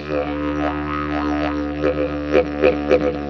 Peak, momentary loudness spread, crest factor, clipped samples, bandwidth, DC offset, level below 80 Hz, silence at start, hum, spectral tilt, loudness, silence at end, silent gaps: -2 dBFS; 6 LU; 18 dB; under 0.1%; 6.6 kHz; under 0.1%; -36 dBFS; 0 s; none; -7.5 dB/octave; -20 LUFS; 0 s; none